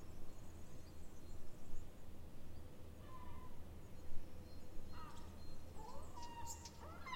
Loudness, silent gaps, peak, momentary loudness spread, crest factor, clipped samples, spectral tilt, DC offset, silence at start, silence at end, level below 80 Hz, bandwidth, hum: -57 LUFS; none; -28 dBFS; 6 LU; 16 dB; under 0.1%; -4.5 dB/octave; under 0.1%; 0 s; 0 s; -54 dBFS; 16 kHz; none